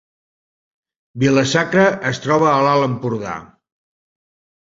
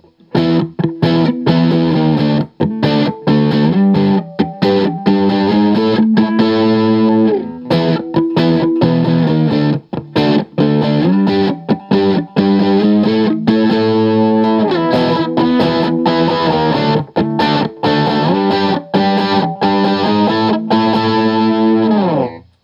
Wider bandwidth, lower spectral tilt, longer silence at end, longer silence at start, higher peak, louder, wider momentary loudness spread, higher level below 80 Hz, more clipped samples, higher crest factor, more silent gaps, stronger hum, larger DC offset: first, 7.8 kHz vs 7 kHz; second, -5.5 dB/octave vs -8.5 dB/octave; first, 1.2 s vs 0.25 s; first, 1.15 s vs 0.35 s; about the same, -2 dBFS vs 0 dBFS; second, -16 LUFS vs -13 LUFS; first, 11 LU vs 4 LU; about the same, -54 dBFS vs -50 dBFS; neither; first, 18 dB vs 12 dB; neither; neither; neither